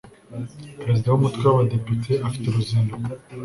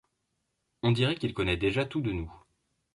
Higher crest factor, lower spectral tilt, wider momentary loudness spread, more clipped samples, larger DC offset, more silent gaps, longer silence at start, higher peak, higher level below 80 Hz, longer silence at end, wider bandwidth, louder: about the same, 18 dB vs 18 dB; about the same, -8 dB/octave vs -7 dB/octave; first, 16 LU vs 8 LU; neither; neither; neither; second, 0.05 s vs 0.85 s; first, -4 dBFS vs -14 dBFS; about the same, -50 dBFS vs -48 dBFS; second, 0 s vs 0.55 s; about the same, 11.5 kHz vs 11.5 kHz; first, -22 LUFS vs -29 LUFS